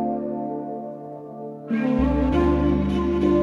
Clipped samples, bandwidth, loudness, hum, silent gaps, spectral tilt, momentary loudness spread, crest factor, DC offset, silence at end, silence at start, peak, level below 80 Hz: under 0.1%; 7.2 kHz; -23 LUFS; none; none; -9 dB/octave; 16 LU; 16 dB; under 0.1%; 0 s; 0 s; -6 dBFS; -32 dBFS